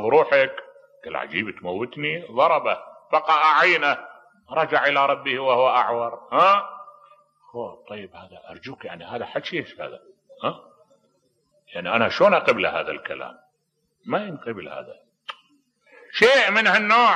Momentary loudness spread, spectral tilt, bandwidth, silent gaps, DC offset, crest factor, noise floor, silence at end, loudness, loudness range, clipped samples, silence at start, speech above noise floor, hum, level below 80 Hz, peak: 22 LU; -4 dB/octave; 10.5 kHz; none; under 0.1%; 18 dB; -73 dBFS; 0 s; -20 LUFS; 14 LU; under 0.1%; 0 s; 51 dB; none; -68 dBFS; -4 dBFS